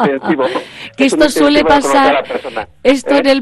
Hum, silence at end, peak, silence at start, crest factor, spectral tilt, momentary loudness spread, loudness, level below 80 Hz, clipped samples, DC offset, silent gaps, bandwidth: none; 0 s; 0 dBFS; 0 s; 12 dB; -4 dB/octave; 12 LU; -12 LUFS; -40 dBFS; under 0.1%; under 0.1%; none; 12.5 kHz